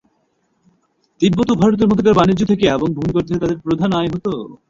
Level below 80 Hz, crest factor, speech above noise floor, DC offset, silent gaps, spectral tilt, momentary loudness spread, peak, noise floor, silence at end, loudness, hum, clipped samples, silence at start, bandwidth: -42 dBFS; 16 dB; 49 dB; under 0.1%; none; -7 dB/octave; 7 LU; -2 dBFS; -64 dBFS; 0.15 s; -16 LUFS; none; under 0.1%; 1.2 s; 7.6 kHz